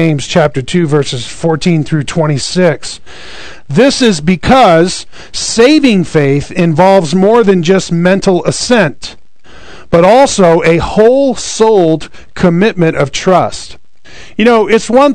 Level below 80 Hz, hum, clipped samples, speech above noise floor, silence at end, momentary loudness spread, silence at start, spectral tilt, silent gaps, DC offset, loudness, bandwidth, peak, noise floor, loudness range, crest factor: -36 dBFS; none; 3%; 29 dB; 0 s; 13 LU; 0 s; -5.5 dB/octave; none; 4%; -9 LUFS; 12 kHz; 0 dBFS; -38 dBFS; 3 LU; 10 dB